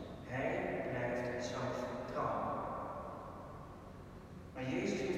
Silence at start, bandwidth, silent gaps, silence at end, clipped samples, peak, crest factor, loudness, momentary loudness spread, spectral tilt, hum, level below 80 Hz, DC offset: 0 s; 16 kHz; none; 0 s; under 0.1%; -24 dBFS; 16 dB; -40 LUFS; 15 LU; -6 dB/octave; none; -60 dBFS; under 0.1%